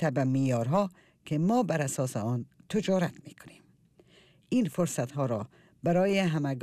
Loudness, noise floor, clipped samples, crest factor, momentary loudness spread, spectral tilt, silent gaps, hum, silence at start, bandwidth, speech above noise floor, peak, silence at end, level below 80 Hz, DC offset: -29 LUFS; -62 dBFS; under 0.1%; 14 dB; 9 LU; -6.5 dB/octave; none; none; 0 s; 15 kHz; 33 dB; -16 dBFS; 0 s; -68 dBFS; under 0.1%